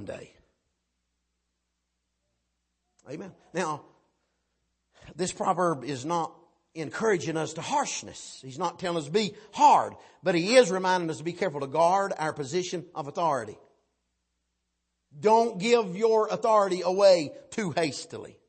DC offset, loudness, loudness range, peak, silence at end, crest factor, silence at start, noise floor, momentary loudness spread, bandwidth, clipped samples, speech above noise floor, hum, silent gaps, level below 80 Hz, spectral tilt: under 0.1%; -26 LUFS; 16 LU; -6 dBFS; 0.15 s; 22 dB; 0 s; -80 dBFS; 18 LU; 8.8 kHz; under 0.1%; 54 dB; none; none; -72 dBFS; -4.5 dB/octave